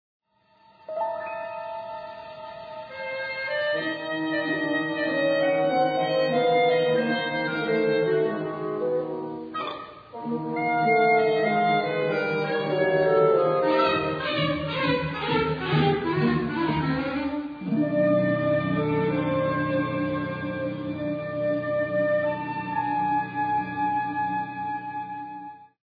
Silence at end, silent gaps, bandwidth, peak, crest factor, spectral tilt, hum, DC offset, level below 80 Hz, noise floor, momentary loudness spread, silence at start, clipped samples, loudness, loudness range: 0.3 s; none; 5 kHz; -10 dBFS; 16 dB; -8.5 dB/octave; none; under 0.1%; -56 dBFS; -60 dBFS; 12 LU; 0.9 s; under 0.1%; -25 LUFS; 5 LU